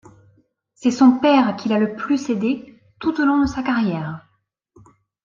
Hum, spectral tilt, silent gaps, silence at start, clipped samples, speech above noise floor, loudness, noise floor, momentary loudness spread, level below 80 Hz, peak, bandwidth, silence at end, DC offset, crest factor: none; -6 dB/octave; none; 0.8 s; under 0.1%; 50 dB; -19 LUFS; -67 dBFS; 12 LU; -50 dBFS; -2 dBFS; 7.6 kHz; 1.05 s; under 0.1%; 18 dB